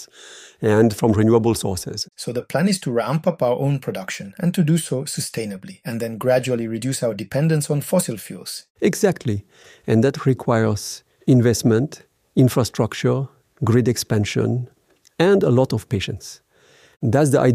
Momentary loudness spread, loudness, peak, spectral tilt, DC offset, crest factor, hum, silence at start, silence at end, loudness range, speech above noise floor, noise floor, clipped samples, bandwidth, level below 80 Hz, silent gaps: 14 LU; -20 LUFS; -2 dBFS; -6 dB/octave; under 0.1%; 18 dB; none; 0 s; 0 s; 3 LU; 34 dB; -53 dBFS; under 0.1%; 15.5 kHz; -54 dBFS; 8.70-8.75 s